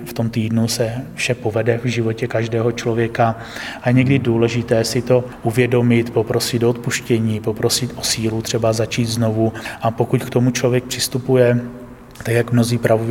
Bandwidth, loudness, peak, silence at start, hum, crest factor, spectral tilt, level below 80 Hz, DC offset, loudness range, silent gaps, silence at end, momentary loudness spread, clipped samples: 17 kHz; -18 LUFS; -2 dBFS; 0 s; none; 16 dB; -5.5 dB/octave; -46 dBFS; under 0.1%; 2 LU; none; 0 s; 6 LU; under 0.1%